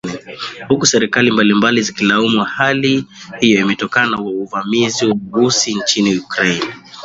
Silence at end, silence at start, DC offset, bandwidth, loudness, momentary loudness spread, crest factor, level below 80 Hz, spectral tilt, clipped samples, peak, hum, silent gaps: 0 s; 0.05 s; under 0.1%; 8 kHz; -14 LUFS; 9 LU; 16 dB; -54 dBFS; -3.5 dB/octave; under 0.1%; 0 dBFS; none; none